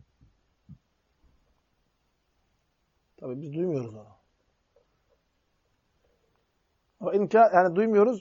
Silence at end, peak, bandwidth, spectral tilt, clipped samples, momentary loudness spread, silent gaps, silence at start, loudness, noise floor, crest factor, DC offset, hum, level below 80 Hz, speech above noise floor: 0 s; -6 dBFS; 7.2 kHz; -8 dB/octave; under 0.1%; 20 LU; none; 0.7 s; -24 LUFS; -73 dBFS; 22 dB; under 0.1%; none; -72 dBFS; 50 dB